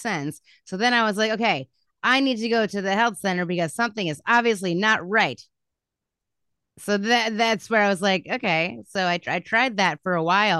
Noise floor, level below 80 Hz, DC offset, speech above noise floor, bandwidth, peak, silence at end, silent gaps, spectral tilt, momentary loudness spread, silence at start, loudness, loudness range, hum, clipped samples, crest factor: -85 dBFS; -72 dBFS; under 0.1%; 63 dB; 12.5 kHz; -6 dBFS; 0 s; none; -4 dB/octave; 7 LU; 0 s; -22 LUFS; 2 LU; none; under 0.1%; 18 dB